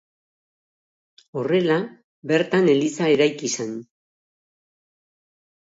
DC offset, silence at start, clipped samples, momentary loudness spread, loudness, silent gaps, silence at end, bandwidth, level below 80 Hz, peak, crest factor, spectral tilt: under 0.1%; 1.35 s; under 0.1%; 16 LU; -21 LUFS; 2.04-2.22 s; 1.85 s; 8 kHz; -72 dBFS; -6 dBFS; 18 dB; -5 dB/octave